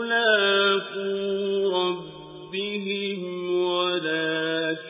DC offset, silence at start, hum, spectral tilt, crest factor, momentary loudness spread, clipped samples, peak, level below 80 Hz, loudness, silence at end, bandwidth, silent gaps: under 0.1%; 0 s; none; -8.5 dB/octave; 18 dB; 11 LU; under 0.1%; -8 dBFS; -70 dBFS; -24 LUFS; 0 s; 3.9 kHz; none